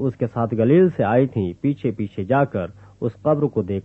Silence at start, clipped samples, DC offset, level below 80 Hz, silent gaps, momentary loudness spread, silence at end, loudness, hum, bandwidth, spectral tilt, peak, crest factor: 0 s; under 0.1%; under 0.1%; -56 dBFS; none; 12 LU; 0 s; -21 LUFS; none; 4.1 kHz; -10.5 dB/octave; -4 dBFS; 16 dB